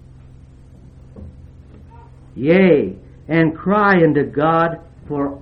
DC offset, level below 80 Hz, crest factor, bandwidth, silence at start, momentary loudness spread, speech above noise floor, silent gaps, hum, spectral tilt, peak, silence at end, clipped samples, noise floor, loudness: under 0.1%; -44 dBFS; 18 dB; 5.8 kHz; 1.15 s; 15 LU; 27 dB; none; none; -10 dB/octave; 0 dBFS; 0.05 s; under 0.1%; -42 dBFS; -16 LUFS